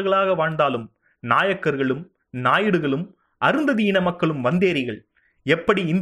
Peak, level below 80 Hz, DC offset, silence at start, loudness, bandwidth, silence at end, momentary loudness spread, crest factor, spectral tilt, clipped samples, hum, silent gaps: -4 dBFS; -58 dBFS; under 0.1%; 0 s; -21 LUFS; 11.5 kHz; 0 s; 12 LU; 18 dB; -7 dB/octave; under 0.1%; none; none